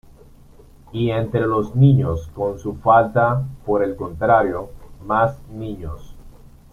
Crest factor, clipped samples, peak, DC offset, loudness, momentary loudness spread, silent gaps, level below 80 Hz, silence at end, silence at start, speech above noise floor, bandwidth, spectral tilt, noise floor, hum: 18 dB; under 0.1%; -2 dBFS; under 0.1%; -19 LUFS; 18 LU; none; -42 dBFS; 0.4 s; 0.95 s; 27 dB; 6.8 kHz; -9 dB/octave; -46 dBFS; none